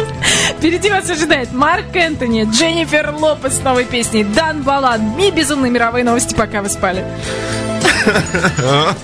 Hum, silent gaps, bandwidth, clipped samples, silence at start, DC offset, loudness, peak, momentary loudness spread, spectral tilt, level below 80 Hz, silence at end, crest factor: none; none; 11 kHz; under 0.1%; 0 s; under 0.1%; -14 LUFS; 0 dBFS; 4 LU; -3.5 dB/octave; -36 dBFS; 0 s; 14 dB